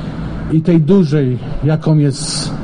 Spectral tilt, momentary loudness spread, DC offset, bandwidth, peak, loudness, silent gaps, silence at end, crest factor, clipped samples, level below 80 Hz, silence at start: -6.5 dB/octave; 8 LU; under 0.1%; 10 kHz; -2 dBFS; -14 LUFS; none; 0 s; 12 dB; under 0.1%; -32 dBFS; 0 s